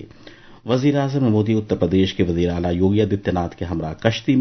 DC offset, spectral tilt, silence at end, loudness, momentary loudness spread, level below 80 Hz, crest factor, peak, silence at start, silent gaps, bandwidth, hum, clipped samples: under 0.1%; -7.5 dB/octave; 0 s; -20 LUFS; 7 LU; -38 dBFS; 18 dB; -2 dBFS; 0 s; none; 6.4 kHz; none; under 0.1%